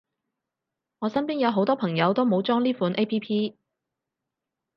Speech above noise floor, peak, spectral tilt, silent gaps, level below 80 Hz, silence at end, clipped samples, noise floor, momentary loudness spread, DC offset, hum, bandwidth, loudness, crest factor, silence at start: 62 dB; -8 dBFS; -8.5 dB/octave; none; -74 dBFS; 1.25 s; under 0.1%; -86 dBFS; 6 LU; under 0.1%; none; 6 kHz; -25 LUFS; 18 dB; 1 s